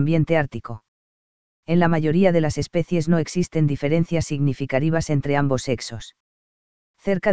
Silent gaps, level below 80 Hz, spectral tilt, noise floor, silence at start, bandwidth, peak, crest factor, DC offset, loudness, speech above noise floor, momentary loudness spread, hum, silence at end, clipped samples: 0.88-1.63 s, 6.20-6.94 s; -46 dBFS; -7 dB/octave; under -90 dBFS; 0 s; 8 kHz; -4 dBFS; 18 dB; 2%; -21 LUFS; over 69 dB; 13 LU; none; 0 s; under 0.1%